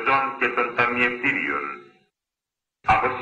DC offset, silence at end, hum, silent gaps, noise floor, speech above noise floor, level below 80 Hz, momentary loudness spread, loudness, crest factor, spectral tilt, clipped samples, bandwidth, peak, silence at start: under 0.1%; 0 s; none; none; -87 dBFS; 64 dB; -52 dBFS; 9 LU; -22 LUFS; 16 dB; -5.5 dB/octave; under 0.1%; 8.8 kHz; -8 dBFS; 0 s